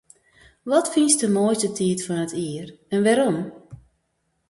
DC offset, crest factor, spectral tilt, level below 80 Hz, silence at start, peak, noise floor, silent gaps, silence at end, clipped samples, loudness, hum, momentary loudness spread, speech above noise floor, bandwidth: under 0.1%; 20 dB; -4.5 dB/octave; -62 dBFS; 0.65 s; -4 dBFS; -72 dBFS; none; 0.75 s; under 0.1%; -21 LUFS; none; 13 LU; 51 dB; 12 kHz